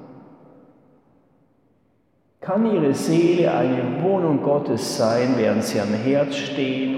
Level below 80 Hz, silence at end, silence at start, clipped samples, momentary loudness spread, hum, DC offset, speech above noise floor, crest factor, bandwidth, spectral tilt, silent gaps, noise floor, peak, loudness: -70 dBFS; 0 s; 0 s; under 0.1%; 6 LU; none; under 0.1%; 44 dB; 14 dB; 16 kHz; -6 dB/octave; none; -64 dBFS; -8 dBFS; -20 LUFS